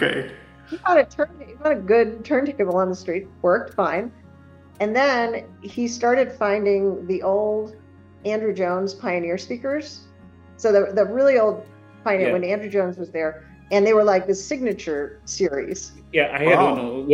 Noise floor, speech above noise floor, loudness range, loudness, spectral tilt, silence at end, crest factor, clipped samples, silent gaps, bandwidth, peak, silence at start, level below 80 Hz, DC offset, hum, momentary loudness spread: -47 dBFS; 26 dB; 3 LU; -21 LUFS; -5 dB/octave; 0 s; 20 dB; under 0.1%; none; 10.5 kHz; -2 dBFS; 0 s; -56 dBFS; under 0.1%; none; 12 LU